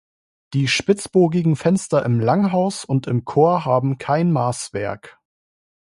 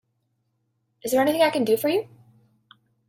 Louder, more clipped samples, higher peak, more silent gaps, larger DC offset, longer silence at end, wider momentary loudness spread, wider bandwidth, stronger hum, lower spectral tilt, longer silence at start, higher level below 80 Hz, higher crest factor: first, -19 LUFS vs -22 LUFS; neither; first, -2 dBFS vs -8 dBFS; neither; neither; second, 0.85 s vs 1.05 s; second, 9 LU vs 13 LU; second, 11.5 kHz vs 16.5 kHz; neither; first, -6 dB/octave vs -4 dB/octave; second, 0.5 s vs 1.05 s; first, -56 dBFS vs -68 dBFS; about the same, 18 dB vs 16 dB